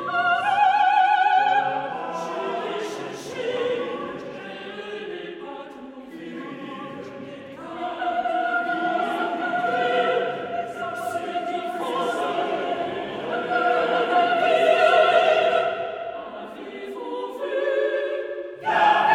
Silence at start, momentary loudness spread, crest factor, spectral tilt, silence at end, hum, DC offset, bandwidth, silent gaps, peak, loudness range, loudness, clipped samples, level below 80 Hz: 0 s; 17 LU; 18 dB; -4 dB/octave; 0 s; none; under 0.1%; 13.5 kHz; none; -6 dBFS; 12 LU; -23 LUFS; under 0.1%; -68 dBFS